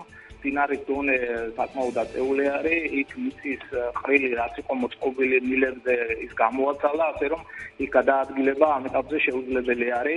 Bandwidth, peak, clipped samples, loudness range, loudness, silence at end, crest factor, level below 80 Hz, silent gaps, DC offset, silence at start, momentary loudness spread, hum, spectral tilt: 11 kHz; -4 dBFS; under 0.1%; 2 LU; -25 LUFS; 0 s; 20 dB; -54 dBFS; none; under 0.1%; 0 s; 8 LU; none; -6 dB/octave